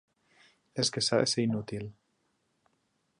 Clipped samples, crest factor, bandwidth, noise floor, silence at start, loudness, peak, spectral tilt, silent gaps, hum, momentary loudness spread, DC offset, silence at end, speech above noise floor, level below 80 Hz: under 0.1%; 22 dB; 11.5 kHz; -76 dBFS; 0.75 s; -30 LUFS; -12 dBFS; -4 dB/octave; none; none; 15 LU; under 0.1%; 1.3 s; 46 dB; -68 dBFS